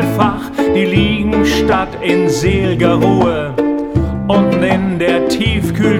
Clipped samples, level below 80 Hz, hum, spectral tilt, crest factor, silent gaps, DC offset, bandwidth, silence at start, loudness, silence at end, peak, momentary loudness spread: under 0.1%; -28 dBFS; none; -6.5 dB/octave; 12 dB; none; under 0.1%; 17 kHz; 0 s; -13 LUFS; 0 s; 0 dBFS; 4 LU